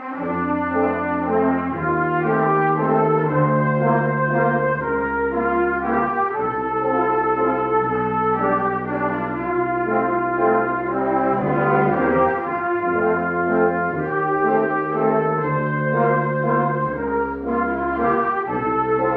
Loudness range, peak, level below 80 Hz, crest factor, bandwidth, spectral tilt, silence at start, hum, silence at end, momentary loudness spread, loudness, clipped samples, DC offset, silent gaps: 2 LU; -6 dBFS; -48 dBFS; 14 dB; 4.6 kHz; -11 dB/octave; 0 s; none; 0 s; 4 LU; -20 LUFS; under 0.1%; under 0.1%; none